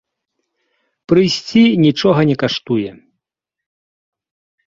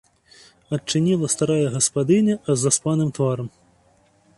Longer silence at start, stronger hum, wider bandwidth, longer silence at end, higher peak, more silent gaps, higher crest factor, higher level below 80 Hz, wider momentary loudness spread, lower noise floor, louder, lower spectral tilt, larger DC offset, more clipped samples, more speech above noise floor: first, 1.1 s vs 0.7 s; neither; second, 7.6 kHz vs 11.5 kHz; first, 1.75 s vs 0.9 s; first, -2 dBFS vs -6 dBFS; neither; about the same, 16 dB vs 16 dB; about the same, -54 dBFS vs -58 dBFS; about the same, 9 LU vs 10 LU; first, -81 dBFS vs -59 dBFS; first, -14 LUFS vs -21 LUFS; first, -6.5 dB/octave vs -5 dB/octave; neither; neither; first, 68 dB vs 38 dB